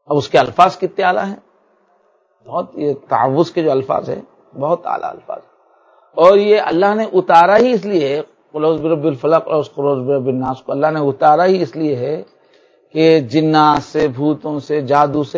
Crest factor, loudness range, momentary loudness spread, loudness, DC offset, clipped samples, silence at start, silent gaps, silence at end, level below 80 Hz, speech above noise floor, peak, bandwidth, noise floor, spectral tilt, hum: 16 dB; 6 LU; 13 LU; -15 LUFS; under 0.1%; 0.2%; 0.1 s; none; 0 s; -56 dBFS; 43 dB; 0 dBFS; 8 kHz; -57 dBFS; -7 dB/octave; none